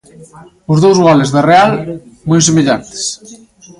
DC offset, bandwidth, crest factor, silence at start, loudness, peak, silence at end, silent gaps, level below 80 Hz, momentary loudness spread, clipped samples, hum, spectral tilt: under 0.1%; 11.5 kHz; 12 dB; 0.2 s; -10 LUFS; 0 dBFS; 0.45 s; none; -48 dBFS; 17 LU; under 0.1%; none; -5 dB/octave